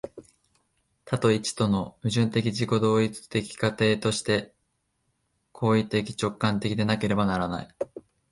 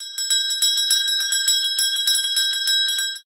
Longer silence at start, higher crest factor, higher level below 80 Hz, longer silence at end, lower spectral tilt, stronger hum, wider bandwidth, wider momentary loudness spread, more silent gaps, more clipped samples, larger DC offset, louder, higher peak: about the same, 0.05 s vs 0 s; about the same, 18 dB vs 16 dB; first, -54 dBFS vs under -90 dBFS; first, 0.3 s vs 0.05 s; first, -5.5 dB/octave vs 9 dB/octave; neither; second, 11.5 kHz vs 16.5 kHz; first, 8 LU vs 2 LU; neither; neither; neither; second, -26 LUFS vs -17 LUFS; second, -8 dBFS vs -4 dBFS